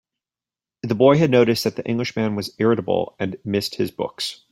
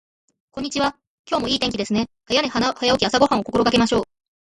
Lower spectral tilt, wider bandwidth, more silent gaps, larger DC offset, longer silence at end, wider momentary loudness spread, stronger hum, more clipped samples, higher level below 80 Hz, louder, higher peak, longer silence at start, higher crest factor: first, -6 dB/octave vs -4 dB/octave; first, 16 kHz vs 11.5 kHz; second, none vs 1.07-1.24 s; neither; second, 0.15 s vs 0.4 s; first, 12 LU vs 9 LU; neither; neither; second, -58 dBFS vs -48 dBFS; about the same, -21 LUFS vs -20 LUFS; about the same, -2 dBFS vs -2 dBFS; first, 0.85 s vs 0.55 s; about the same, 18 dB vs 20 dB